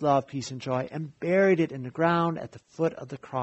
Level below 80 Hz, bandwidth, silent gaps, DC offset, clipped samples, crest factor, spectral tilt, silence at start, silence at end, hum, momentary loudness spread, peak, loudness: -66 dBFS; 8.2 kHz; none; under 0.1%; under 0.1%; 18 dB; -6.5 dB/octave; 0 s; 0 s; none; 13 LU; -8 dBFS; -27 LUFS